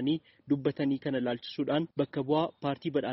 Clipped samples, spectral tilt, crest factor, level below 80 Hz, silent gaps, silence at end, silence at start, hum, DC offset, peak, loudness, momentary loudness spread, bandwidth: under 0.1%; -5.5 dB/octave; 16 dB; -70 dBFS; none; 0 s; 0 s; none; under 0.1%; -14 dBFS; -32 LUFS; 5 LU; 5.8 kHz